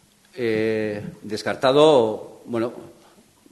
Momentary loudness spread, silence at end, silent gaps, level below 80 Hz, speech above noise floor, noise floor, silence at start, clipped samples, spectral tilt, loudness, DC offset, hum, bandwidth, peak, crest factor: 17 LU; 0.6 s; none; -62 dBFS; 33 dB; -53 dBFS; 0.35 s; under 0.1%; -5.5 dB/octave; -21 LUFS; under 0.1%; none; 12.5 kHz; -2 dBFS; 20 dB